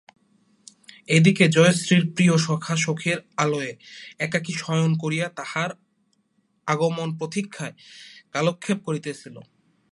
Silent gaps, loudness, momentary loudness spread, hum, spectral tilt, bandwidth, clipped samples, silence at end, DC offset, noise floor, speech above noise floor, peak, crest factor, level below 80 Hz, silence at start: none; -22 LUFS; 19 LU; none; -5 dB/octave; 11.5 kHz; under 0.1%; 0.5 s; under 0.1%; -68 dBFS; 46 dB; -4 dBFS; 20 dB; -68 dBFS; 1.1 s